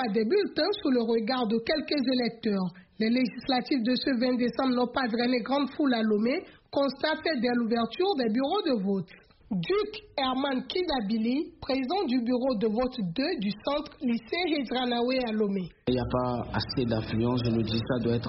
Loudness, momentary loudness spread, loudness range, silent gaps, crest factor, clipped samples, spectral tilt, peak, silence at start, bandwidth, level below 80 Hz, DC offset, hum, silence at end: -28 LUFS; 5 LU; 2 LU; none; 14 dB; under 0.1%; -4.5 dB/octave; -14 dBFS; 0 s; 5.8 kHz; -54 dBFS; under 0.1%; none; 0 s